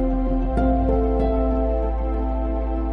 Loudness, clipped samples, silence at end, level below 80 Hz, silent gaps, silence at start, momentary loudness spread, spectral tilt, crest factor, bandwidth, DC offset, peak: -23 LUFS; under 0.1%; 0 s; -22 dBFS; none; 0 s; 5 LU; -11 dB/octave; 12 dB; 3.8 kHz; under 0.1%; -8 dBFS